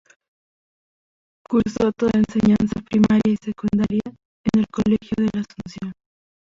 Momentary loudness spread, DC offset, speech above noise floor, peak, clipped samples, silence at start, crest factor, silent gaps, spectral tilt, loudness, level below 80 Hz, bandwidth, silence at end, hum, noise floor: 15 LU; under 0.1%; over 70 dB; -6 dBFS; under 0.1%; 1.5 s; 16 dB; 4.25-4.44 s; -7.5 dB/octave; -20 LUFS; -46 dBFS; 7.6 kHz; 0.65 s; none; under -90 dBFS